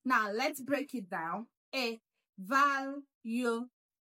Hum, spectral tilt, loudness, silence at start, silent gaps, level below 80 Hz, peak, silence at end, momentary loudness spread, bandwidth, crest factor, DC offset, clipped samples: none; -3.5 dB/octave; -34 LUFS; 0.05 s; 1.57-1.72 s, 2.29-2.33 s, 3.15-3.21 s; under -90 dBFS; -16 dBFS; 0.45 s; 15 LU; 16.5 kHz; 20 dB; under 0.1%; under 0.1%